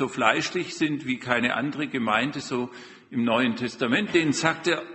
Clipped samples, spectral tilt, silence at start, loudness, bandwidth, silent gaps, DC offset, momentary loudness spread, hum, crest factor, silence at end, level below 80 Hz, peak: under 0.1%; -4 dB/octave; 0 s; -25 LUFS; 8.4 kHz; none; under 0.1%; 8 LU; none; 22 dB; 0 s; -64 dBFS; -4 dBFS